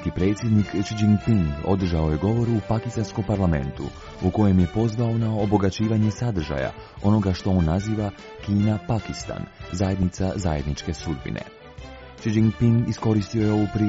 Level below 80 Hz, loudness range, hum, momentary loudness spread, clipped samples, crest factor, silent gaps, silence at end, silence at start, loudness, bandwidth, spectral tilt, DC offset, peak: -40 dBFS; 4 LU; none; 11 LU; under 0.1%; 16 dB; none; 0 s; 0 s; -23 LUFS; 7.8 kHz; -7.5 dB/octave; under 0.1%; -6 dBFS